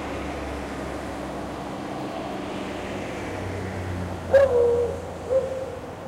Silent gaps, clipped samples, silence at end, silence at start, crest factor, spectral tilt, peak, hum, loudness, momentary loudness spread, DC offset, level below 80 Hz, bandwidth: none; under 0.1%; 0 s; 0 s; 20 dB; -6 dB/octave; -6 dBFS; none; -27 LUFS; 13 LU; under 0.1%; -44 dBFS; 15 kHz